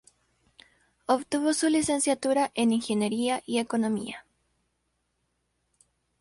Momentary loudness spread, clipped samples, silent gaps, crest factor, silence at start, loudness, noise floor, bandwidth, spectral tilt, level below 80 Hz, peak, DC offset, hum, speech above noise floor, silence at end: 7 LU; under 0.1%; none; 18 dB; 1.1 s; -26 LUFS; -76 dBFS; 11.5 kHz; -3.5 dB/octave; -68 dBFS; -10 dBFS; under 0.1%; none; 50 dB; 2 s